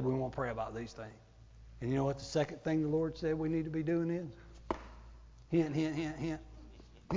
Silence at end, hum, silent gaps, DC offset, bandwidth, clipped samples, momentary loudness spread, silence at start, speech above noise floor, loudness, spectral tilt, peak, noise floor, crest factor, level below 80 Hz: 0 s; none; none; under 0.1%; 7.6 kHz; under 0.1%; 18 LU; 0 s; 20 dB; -36 LUFS; -7.5 dB/octave; -18 dBFS; -55 dBFS; 18 dB; -56 dBFS